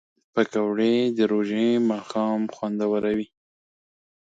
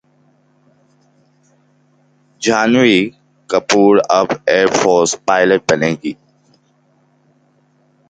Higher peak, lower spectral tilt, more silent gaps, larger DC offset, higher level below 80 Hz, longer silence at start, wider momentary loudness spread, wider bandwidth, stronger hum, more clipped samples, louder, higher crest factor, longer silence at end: second, -6 dBFS vs 0 dBFS; first, -6.5 dB/octave vs -4 dB/octave; neither; neither; second, -66 dBFS vs -56 dBFS; second, 0.35 s vs 2.4 s; second, 7 LU vs 10 LU; second, 7.8 kHz vs 9.4 kHz; neither; neither; second, -24 LUFS vs -13 LUFS; about the same, 18 dB vs 16 dB; second, 1.1 s vs 1.95 s